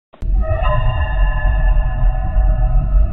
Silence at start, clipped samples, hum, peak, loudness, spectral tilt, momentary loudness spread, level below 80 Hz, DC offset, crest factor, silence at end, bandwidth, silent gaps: 0.1 s; under 0.1%; none; -4 dBFS; -19 LUFS; -9.5 dB/octave; 2 LU; -14 dBFS; 3%; 10 dB; 0 s; 3.6 kHz; none